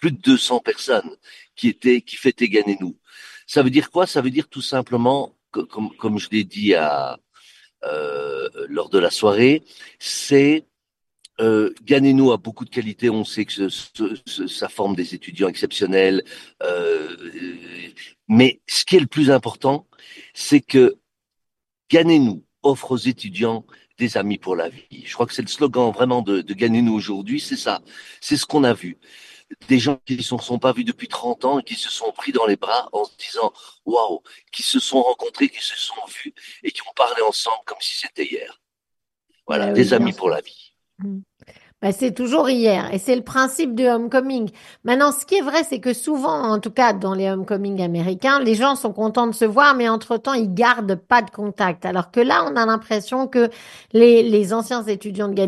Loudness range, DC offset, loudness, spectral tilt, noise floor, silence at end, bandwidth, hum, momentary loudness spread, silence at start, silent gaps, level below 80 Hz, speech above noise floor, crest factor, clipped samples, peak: 5 LU; under 0.1%; -19 LUFS; -5 dB/octave; -83 dBFS; 0 s; 12.5 kHz; none; 13 LU; 0 s; none; -64 dBFS; 64 dB; 20 dB; under 0.1%; 0 dBFS